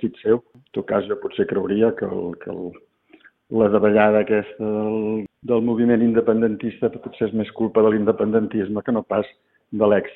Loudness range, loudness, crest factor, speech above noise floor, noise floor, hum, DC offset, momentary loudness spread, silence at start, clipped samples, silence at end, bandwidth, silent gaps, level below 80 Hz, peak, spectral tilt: 4 LU; -21 LUFS; 18 dB; 33 dB; -53 dBFS; none; under 0.1%; 12 LU; 0 s; under 0.1%; 0 s; 4.1 kHz; none; -58 dBFS; -2 dBFS; -11 dB/octave